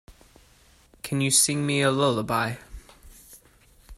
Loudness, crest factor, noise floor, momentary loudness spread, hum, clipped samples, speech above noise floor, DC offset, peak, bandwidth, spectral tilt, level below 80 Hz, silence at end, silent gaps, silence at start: -23 LUFS; 22 dB; -57 dBFS; 14 LU; none; under 0.1%; 34 dB; under 0.1%; -6 dBFS; 16 kHz; -3.5 dB/octave; -52 dBFS; 0.05 s; none; 0.1 s